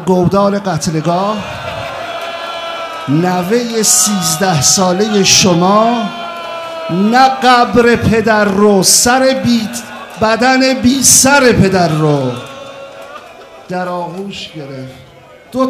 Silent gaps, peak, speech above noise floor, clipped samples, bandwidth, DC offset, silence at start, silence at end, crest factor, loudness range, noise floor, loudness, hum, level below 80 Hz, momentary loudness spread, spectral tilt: none; 0 dBFS; 27 dB; 0.2%; over 20 kHz; under 0.1%; 0 s; 0 s; 12 dB; 7 LU; -38 dBFS; -10 LUFS; none; -44 dBFS; 17 LU; -3.5 dB/octave